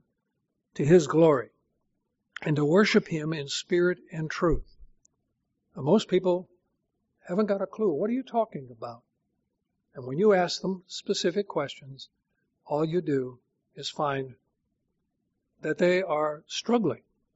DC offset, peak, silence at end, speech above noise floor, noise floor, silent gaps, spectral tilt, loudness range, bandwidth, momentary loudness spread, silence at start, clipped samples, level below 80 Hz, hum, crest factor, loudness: under 0.1%; -8 dBFS; 0.4 s; 54 dB; -80 dBFS; none; -5 dB/octave; 7 LU; 8 kHz; 19 LU; 0.75 s; under 0.1%; -50 dBFS; none; 20 dB; -27 LUFS